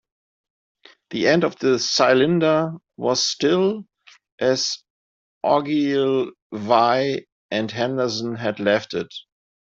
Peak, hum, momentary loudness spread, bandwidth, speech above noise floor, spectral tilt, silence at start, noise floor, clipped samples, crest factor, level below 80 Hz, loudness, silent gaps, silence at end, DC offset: -2 dBFS; none; 12 LU; 7.8 kHz; over 70 dB; -4.5 dB/octave; 1.1 s; under -90 dBFS; under 0.1%; 20 dB; -66 dBFS; -21 LUFS; 4.32-4.38 s, 4.90-5.41 s, 6.42-6.50 s, 7.32-7.49 s; 0.5 s; under 0.1%